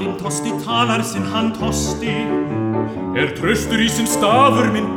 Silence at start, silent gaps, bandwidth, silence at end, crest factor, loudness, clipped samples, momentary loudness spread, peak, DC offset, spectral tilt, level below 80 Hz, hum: 0 s; none; 18.5 kHz; 0 s; 18 dB; -18 LUFS; under 0.1%; 9 LU; 0 dBFS; under 0.1%; -4.5 dB/octave; -38 dBFS; none